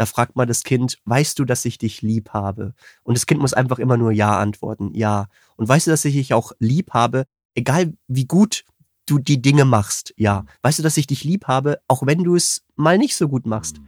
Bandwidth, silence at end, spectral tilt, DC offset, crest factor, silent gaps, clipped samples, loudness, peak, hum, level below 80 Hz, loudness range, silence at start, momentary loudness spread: 17 kHz; 0.05 s; -5.5 dB/octave; under 0.1%; 16 dB; 7.45-7.49 s; under 0.1%; -19 LUFS; -2 dBFS; none; -54 dBFS; 2 LU; 0 s; 9 LU